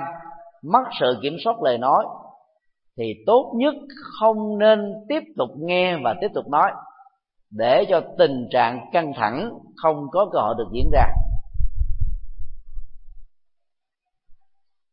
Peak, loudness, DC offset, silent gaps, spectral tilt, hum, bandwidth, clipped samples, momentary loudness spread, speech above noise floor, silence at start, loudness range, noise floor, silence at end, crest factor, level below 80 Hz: -2 dBFS; -22 LUFS; under 0.1%; none; -10.5 dB/octave; none; 5.2 kHz; under 0.1%; 14 LU; 57 dB; 0 s; 7 LU; -77 dBFS; 0.6 s; 20 dB; -30 dBFS